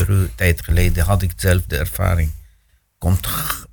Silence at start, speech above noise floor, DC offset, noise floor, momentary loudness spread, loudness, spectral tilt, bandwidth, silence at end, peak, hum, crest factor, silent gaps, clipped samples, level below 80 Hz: 0 s; 40 dB; under 0.1%; -58 dBFS; 6 LU; -19 LUFS; -5.5 dB/octave; 19.5 kHz; 0.05 s; -2 dBFS; none; 16 dB; none; under 0.1%; -24 dBFS